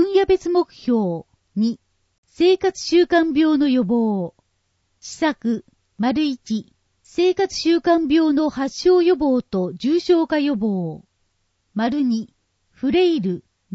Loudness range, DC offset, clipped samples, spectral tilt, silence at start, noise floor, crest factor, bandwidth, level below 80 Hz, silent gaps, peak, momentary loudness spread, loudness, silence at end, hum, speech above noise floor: 5 LU; under 0.1%; under 0.1%; -5.5 dB/octave; 0 s; -69 dBFS; 16 dB; 8 kHz; -54 dBFS; 2.18-2.23 s; -4 dBFS; 12 LU; -20 LUFS; 0 s; none; 50 dB